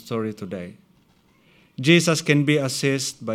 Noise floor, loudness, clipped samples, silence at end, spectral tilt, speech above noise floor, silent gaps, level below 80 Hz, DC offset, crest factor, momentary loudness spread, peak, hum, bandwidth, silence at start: -59 dBFS; -20 LUFS; under 0.1%; 0 s; -4.5 dB/octave; 38 dB; none; -68 dBFS; under 0.1%; 22 dB; 18 LU; -2 dBFS; none; 16 kHz; 0.05 s